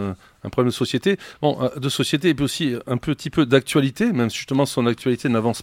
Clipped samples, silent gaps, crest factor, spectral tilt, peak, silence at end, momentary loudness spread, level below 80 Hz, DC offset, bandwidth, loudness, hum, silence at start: under 0.1%; none; 20 dB; -5.5 dB/octave; -2 dBFS; 0 s; 6 LU; -52 dBFS; under 0.1%; 16.5 kHz; -21 LUFS; none; 0 s